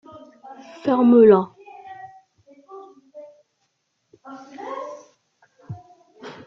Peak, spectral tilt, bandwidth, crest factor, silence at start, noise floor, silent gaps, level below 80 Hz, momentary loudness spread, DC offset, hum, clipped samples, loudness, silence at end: -2 dBFS; -8.5 dB/octave; 6.6 kHz; 20 dB; 0.5 s; -72 dBFS; none; -66 dBFS; 30 LU; under 0.1%; none; under 0.1%; -16 LUFS; 0.15 s